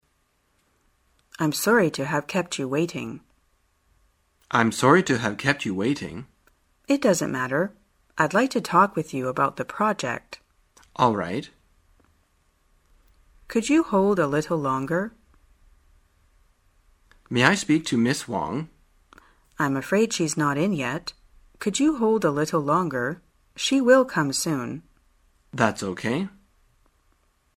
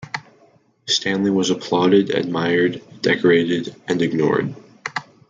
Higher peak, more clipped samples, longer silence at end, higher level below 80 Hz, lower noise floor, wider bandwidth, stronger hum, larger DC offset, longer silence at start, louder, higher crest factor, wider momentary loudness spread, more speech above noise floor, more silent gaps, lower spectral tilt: first, 0 dBFS vs -4 dBFS; neither; first, 1.3 s vs 0.3 s; first, -58 dBFS vs -64 dBFS; first, -69 dBFS vs -55 dBFS; first, 16 kHz vs 9 kHz; neither; neither; first, 1.4 s vs 0 s; second, -23 LUFS vs -19 LUFS; first, 24 dB vs 16 dB; about the same, 14 LU vs 14 LU; first, 46 dB vs 37 dB; neither; about the same, -5 dB/octave vs -5 dB/octave